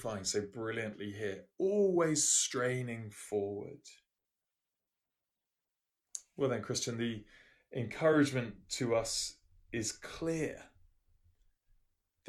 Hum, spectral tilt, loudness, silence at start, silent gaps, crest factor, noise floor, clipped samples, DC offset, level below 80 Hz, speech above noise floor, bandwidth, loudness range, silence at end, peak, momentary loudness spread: none; -3.5 dB/octave; -34 LUFS; 0 s; none; 20 dB; -90 dBFS; under 0.1%; under 0.1%; -66 dBFS; 55 dB; 13.5 kHz; 11 LU; 1.6 s; -18 dBFS; 16 LU